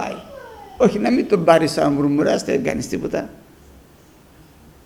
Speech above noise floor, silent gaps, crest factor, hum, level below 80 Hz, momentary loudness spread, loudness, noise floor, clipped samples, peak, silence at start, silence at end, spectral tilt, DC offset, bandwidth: 31 dB; none; 20 dB; none; -48 dBFS; 21 LU; -18 LUFS; -48 dBFS; under 0.1%; 0 dBFS; 0 s; 1.5 s; -6 dB/octave; under 0.1%; 19 kHz